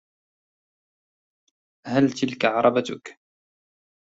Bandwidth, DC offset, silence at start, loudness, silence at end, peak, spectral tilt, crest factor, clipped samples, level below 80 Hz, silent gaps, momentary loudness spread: 7.8 kHz; under 0.1%; 1.85 s; -22 LUFS; 1.05 s; -4 dBFS; -5.5 dB/octave; 22 dB; under 0.1%; -68 dBFS; none; 16 LU